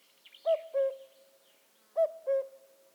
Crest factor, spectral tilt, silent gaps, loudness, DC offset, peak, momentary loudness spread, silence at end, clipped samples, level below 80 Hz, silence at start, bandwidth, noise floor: 14 dB; -0.5 dB/octave; none; -33 LUFS; under 0.1%; -20 dBFS; 11 LU; 0.4 s; under 0.1%; under -90 dBFS; 0.45 s; over 20 kHz; -66 dBFS